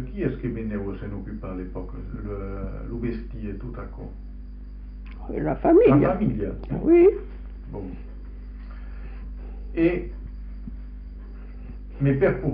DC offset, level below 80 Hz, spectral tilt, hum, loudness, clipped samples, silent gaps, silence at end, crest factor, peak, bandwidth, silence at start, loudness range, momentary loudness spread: under 0.1%; -36 dBFS; -9 dB/octave; none; -24 LUFS; under 0.1%; none; 0 s; 18 dB; -6 dBFS; 5 kHz; 0 s; 13 LU; 23 LU